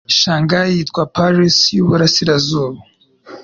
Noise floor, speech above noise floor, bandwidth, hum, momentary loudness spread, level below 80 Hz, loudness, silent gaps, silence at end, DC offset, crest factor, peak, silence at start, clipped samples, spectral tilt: -38 dBFS; 24 dB; 7.4 kHz; none; 7 LU; -48 dBFS; -13 LUFS; none; 0 s; under 0.1%; 12 dB; -2 dBFS; 0.1 s; under 0.1%; -4.5 dB/octave